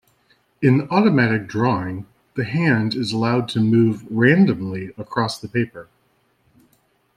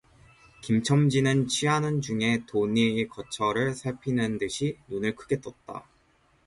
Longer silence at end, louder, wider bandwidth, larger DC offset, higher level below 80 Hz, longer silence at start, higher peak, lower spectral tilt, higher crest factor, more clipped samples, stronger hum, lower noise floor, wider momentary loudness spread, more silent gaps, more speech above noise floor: first, 1.35 s vs 0.65 s; first, -19 LUFS vs -27 LUFS; about the same, 10.5 kHz vs 11.5 kHz; neither; about the same, -58 dBFS vs -58 dBFS; about the same, 0.6 s vs 0.65 s; first, -2 dBFS vs -10 dBFS; first, -7 dB/octave vs -5.5 dB/octave; about the same, 18 dB vs 18 dB; neither; neither; about the same, -63 dBFS vs -64 dBFS; about the same, 12 LU vs 10 LU; neither; first, 45 dB vs 38 dB